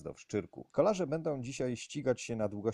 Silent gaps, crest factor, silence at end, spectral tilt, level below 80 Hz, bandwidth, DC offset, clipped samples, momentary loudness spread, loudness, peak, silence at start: none; 20 dB; 0 s; -6 dB/octave; -64 dBFS; 11.5 kHz; under 0.1%; under 0.1%; 8 LU; -35 LUFS; -14 dBFS; 0 s